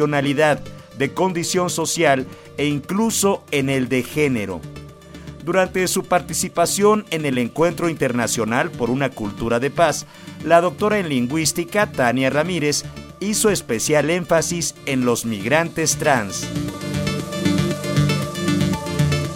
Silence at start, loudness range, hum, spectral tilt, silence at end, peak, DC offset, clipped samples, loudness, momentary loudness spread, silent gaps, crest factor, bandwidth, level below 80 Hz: 0 s; 2 LU; none; -4.5 dB/octave; 0 s; -2 dBFS; under 0.1%; under 0.1%; -20 LUFS; 8 LU; none; 18 dB; 16.5 kHz; -46 dBFS